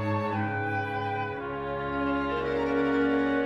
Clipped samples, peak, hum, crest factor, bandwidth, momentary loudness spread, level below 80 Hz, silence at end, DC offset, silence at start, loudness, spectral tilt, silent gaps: under 0.1%; -16 dBFS; none; 12 dB; 7.4 kHz; 7 LU; -50 dBFS; 0 s; under 0.1%; 0 s; -29 LUFS; -8 dB/octave; none